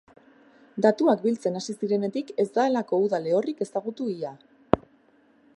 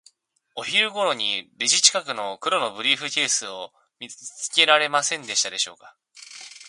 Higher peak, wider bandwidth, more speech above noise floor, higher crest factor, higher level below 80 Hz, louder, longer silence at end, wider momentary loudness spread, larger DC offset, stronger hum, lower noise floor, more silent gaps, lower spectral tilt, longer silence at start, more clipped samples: about the same, 0 dBFS vs 0 dBFS; about the same, 11.5 kHz vs 11.5 kHz; second, 35 dB vs 40 dB; about the same, 26 dB vs 24 dB; first, -58 dBFS vs -78 dBFS; second, -26 LUFS vs -21 LUFS; first, 0.8 s vs 0 s; second, 9 LU vs 22 LU; neither; neither; second, -60 dBFS vs -64 dBFS; neither; first, -6.5 dB/octave vs 0.5 dB/octave; first, 0.75 s vs 0.55 s; neither